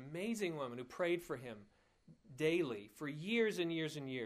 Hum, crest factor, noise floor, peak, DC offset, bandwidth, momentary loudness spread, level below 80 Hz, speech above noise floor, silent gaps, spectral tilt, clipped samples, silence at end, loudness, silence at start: none; 18 dB; -67 dBFS; -22 dBFS; under 0.1%; 15.5 kHz; 11 LU; -78 dBFS; 27 dB; none; -5 dB/octave; under 0.1%; 0 s; -40 LUFS; 0 s